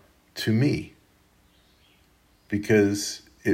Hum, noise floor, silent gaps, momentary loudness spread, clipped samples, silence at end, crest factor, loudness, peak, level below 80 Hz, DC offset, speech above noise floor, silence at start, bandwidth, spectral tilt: none; -61 dBFS; none; 13 LU; under 0.1%; 0 s; 20 dB; -25 LUFS; -8 dBFS; -60 dBFS; under 0.1%; 38 dB; 0.35 s; 16 kHz; -5.5 dB/octave